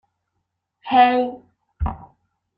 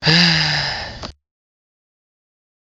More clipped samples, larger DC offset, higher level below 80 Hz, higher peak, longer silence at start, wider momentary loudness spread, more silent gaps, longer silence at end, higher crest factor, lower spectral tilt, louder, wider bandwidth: neither; neither; first, -38 dBFS vs -44 dBFS; about the same, -2 dBFS vs 0 dBFS; first, 0.85 s vs 0 s; about the same, 23 LU vs 22 LU; neither; second, 0.55 s vs 1.5 s; about the same, 20 dB vs 20 dB; first, -8.5 dB/octave vs -4 dB/octave; second, -19 LUFS vs -15 LUFS; second, 5.2 kHz vs 8 kHz